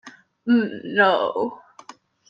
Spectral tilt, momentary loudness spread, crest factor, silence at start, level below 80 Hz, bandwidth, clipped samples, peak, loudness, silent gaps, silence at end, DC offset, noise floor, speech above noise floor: -6 dB/octave; 11 LU; 20 dB; 0.05 s; -74 dBFS; 7.2 kHz; under 0.1%; -4 dBFS; -21 LUFS; none; 0.75 s; under 0.1%; -47 dBFS; 27 dB